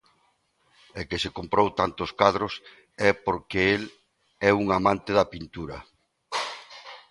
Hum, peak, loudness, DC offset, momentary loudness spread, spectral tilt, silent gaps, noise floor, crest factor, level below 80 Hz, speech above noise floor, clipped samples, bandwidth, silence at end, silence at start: none; -2 dBFS; -25 LUFS; under 0.1%; 17 LU; -5 dB/octave; none; -68 dBFS; 26 dB; -52 dBFS; 43 dB; under 0.1%; 11.5 kHz; 0.15 s; 0.95 s